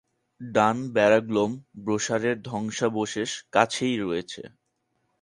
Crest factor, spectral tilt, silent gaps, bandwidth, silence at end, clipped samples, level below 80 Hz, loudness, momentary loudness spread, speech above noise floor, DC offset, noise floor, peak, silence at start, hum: 22 dB; -4.5 dB/octave; none; 11.5 kHz; 0.75 s; under 0.1%; -64 dBFS; -25 LUFS; 11 LU; 50 dB; under 0.1%; -75 dBFS; -4 dBFS; 0.4 s; none